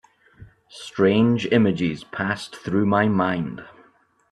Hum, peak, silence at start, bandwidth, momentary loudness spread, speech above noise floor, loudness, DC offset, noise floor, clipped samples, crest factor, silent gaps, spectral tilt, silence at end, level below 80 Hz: none; -4 dBFS; 0.4 s; 11 kHz; 14 LU; 37 dB; -21 LUFS; under 0.1%; -58 dBFS; under 0.1%; 18 dB; none; -7 dB/octave; 0.6 s; -58 dBFS